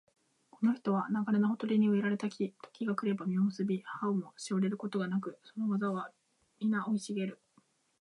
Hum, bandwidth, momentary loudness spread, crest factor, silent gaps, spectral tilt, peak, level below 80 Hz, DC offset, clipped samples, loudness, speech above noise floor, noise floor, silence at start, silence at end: none; 11 kHz; 8 LU; 14 dB; none; -7 dB/octave; -18 dBFS; -84 dBFS; under 0.1%; under 0.1%; -34 LUFS; 38 dB; -70 dBFS; 0.6 s; 0.7 s